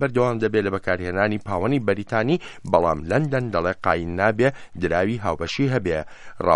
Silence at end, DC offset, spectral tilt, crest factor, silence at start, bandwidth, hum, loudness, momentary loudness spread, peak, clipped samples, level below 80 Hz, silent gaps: 0 s; under 0.1%; -7 dB/octave; 20 dB; 0 s; 11 kHz; none; -23 LUFS; 5 LU; -2 dBFS; under 0.1%; -46 dBFS; none